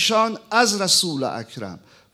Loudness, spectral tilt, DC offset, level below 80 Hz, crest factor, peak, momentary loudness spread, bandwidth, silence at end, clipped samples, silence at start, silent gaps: -19 LUFS; -2 dB/octave; under 0.1%; -68 dBFS; 20 dB; -2 dBFS; 17 LU; 17 kHz; 0.35 s; under 0.1%; 0 s; none